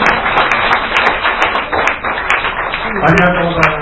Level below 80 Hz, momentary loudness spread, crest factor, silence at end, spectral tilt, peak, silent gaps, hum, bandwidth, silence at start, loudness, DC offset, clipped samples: -32 dBFS; 5 LU; 12 dB; 0 s; -5 dB/octave; 0 dBFS; none; none; 8 kHz; 0 s; -12 LUFS; under 0.1%; 0.3%